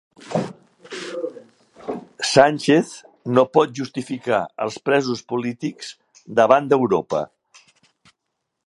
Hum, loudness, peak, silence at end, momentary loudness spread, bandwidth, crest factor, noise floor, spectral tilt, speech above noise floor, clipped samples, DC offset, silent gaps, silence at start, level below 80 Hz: none; -20 LUFS; 0 dBFS; 1.4 s; 18 LU; 11.5 kHz; 22 dB; -78 dBFS; -5 dB/octave; 59 dB; under 0.1%; under 0.1%; none; 0.25 s; -66 dBFS